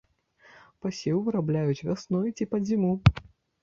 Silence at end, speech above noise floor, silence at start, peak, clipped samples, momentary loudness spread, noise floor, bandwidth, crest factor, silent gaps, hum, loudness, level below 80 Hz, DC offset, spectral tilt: 0.4 s; 34 dB; 0.85 s; -2 dBFS; under 0.1%; 10 LU; -60 dBFS; 7.4 kHz; 26 dB; none; none; -27 LUFS; -44 dBFS; under 0.1%; -7.5 dB/octave